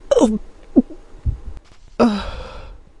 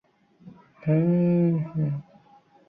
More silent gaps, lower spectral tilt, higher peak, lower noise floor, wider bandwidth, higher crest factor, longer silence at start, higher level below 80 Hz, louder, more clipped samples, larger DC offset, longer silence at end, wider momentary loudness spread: neither; second, -6.5 dB/octave vs -13 dB/octave; first, 0 dBFS vs -12 dBFS; second, -37 dBFS vs -57 dBFS; first, 11 kHz vs 2.9 kHz; first, 20 dB vs 14 dB; second, 0.05 s vs 0.45 s; first, -32 dBFS vs -64 dBFS; first, -20 LUFS vs -24 LUFS; neither; neither; second, 0.25 s vs 0.65 s; first, 20 LU vs 11 LU